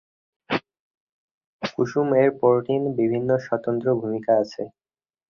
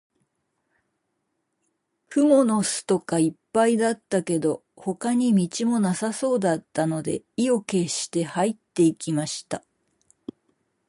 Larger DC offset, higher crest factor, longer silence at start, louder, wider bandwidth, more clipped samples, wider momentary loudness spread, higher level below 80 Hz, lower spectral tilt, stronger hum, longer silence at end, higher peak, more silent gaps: neither; about the same, 18 dB vs 18 dB; second, 0.5 s vs 2.1 s; about the same, -23 LUFS vs -24 LUFS; second, 7 kHz vs 11.5 kHz; neither; about the same, 11 LU vs 11 LU; about the same, -64 dBFS vs -68 dBFS; first, -7.5 dB/octave vs -5 dB/octave; neither; second, 0.65 s vs 1.3 s; about the same, -6 dBFS vs -8 dBFS; first, 0.80-0.91 s, 0.97-1.59 s vs none